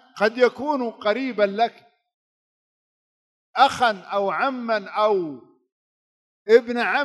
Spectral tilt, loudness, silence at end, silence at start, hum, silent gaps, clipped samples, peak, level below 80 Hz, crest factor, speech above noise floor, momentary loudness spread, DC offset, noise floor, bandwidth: -4.5 dB/octave; -21 LUFS; 0 s; 0.15 s; none; 2.14-3.54 s, 5.72-6.46 s; under 0.1%; -2 dBFS; -70 dBFS; 22 dB; over 69 dB; 8 LU; under 0.1%; under -90 dBFS; 12 kHz